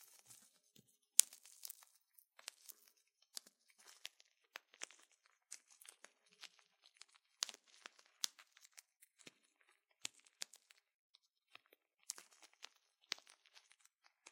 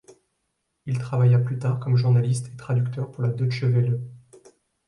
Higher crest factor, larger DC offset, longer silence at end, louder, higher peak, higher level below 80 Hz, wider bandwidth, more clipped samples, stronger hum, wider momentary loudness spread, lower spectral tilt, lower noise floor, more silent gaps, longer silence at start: first, 52 dB vs 14 dB; neither; first, 1.65 s vs 0.7 s; second, -43 LUFS vs -23 LUFS; first, 0 dBFS vs -10 dBFS; second, under -90 dBFS vs -60 dBFS; first, 16.5 kHz vs 11.5 kHz; neither; neither; first, 20 LU vs 10 LU; second, 3.5 dB/octave vs -8 dB/octave; about the same, -78 dBFS vs -76 dBFS; first, 10.95-11.14 s vs none; first, 1.2 s vs 0.85 s